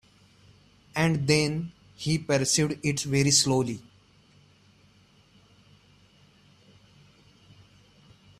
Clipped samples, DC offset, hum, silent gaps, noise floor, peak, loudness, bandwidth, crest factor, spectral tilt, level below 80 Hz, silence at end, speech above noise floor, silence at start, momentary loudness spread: under 0.1%; under 0.1%; none; none; -60 dBFS; -8 dBFS; -25 LUFS; 14.5 kHz; 20 dB; -4 dB/octave; -60 dBFS; 4.6 s; 35 dB; 0.95 s; 14 LU